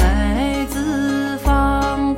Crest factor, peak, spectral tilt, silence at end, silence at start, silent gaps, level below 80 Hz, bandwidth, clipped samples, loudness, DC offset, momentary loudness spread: 14 dB; -4 dBFS; -6 dB/octave; 0 s; 0 s; none; -22 dBFS; 16.5 kHz; under 0.1%; -19 LUFS; under 0.1%; 4 LU